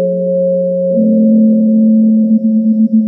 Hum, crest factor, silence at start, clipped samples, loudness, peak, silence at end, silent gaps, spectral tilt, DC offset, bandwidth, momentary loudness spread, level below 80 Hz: none; 8 dB; 0 s; under 0.1%; -10 LUFS; -2 dBFS; 0 s; none; -15 dB/octave; under 0.1%; 0.7 kHz; 5 LU; -68 dBFS